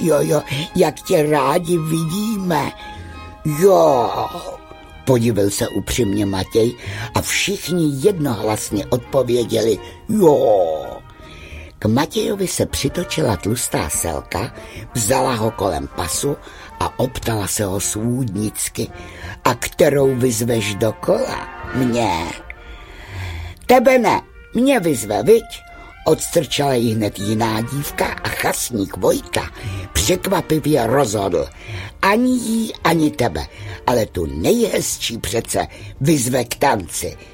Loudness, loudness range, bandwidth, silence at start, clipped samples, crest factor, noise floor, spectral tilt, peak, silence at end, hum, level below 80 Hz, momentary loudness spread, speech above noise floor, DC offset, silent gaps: -18 LUFS; 4 LU; 17 kHz; 0 s; under 0.1%; 18 dB; -38 dBFS; -4.5 dB/octave; 0 dBFS; 0.05 s; none; -40 dBFS; 14 LU; 20 dB; under 0.1%; none